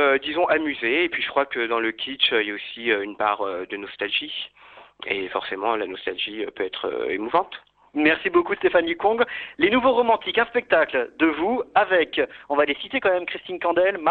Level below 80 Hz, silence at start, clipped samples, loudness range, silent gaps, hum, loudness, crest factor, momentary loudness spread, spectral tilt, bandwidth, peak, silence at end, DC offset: -60 dBFS; 0 s; under 0.1%; 6 LU; none; none; -23 LUFS; 18 dB; 9 LU; -7 dB/octave; 4.7 kHz; -6 dBFS; 0 s; under 0.1%